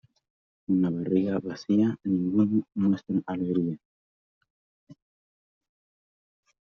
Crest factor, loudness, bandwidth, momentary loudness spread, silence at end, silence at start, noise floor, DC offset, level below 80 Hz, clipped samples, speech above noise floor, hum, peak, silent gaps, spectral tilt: 18 dB; -27 LUFS; 6.4 kHz; 7 LU; 1.75 s; 0.7 s; under -90 dBFS; under 0.1%; -70 dBFS; under 0.1%; over 64 dB; none; -12 dBFS; 3.85-4.41 s, 4.50-4.87 s; -9 dB/octave